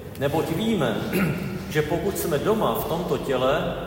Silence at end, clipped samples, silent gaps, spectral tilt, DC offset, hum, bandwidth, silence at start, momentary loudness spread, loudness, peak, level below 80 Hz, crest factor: 0 s; under 0.1%; none; -5.5 dB/octave; under 0.1%; none; 16.5 kHz; 0 s; 4 LU; -24 LUFS; -8 dBFS; -46 dBFS; 16 dB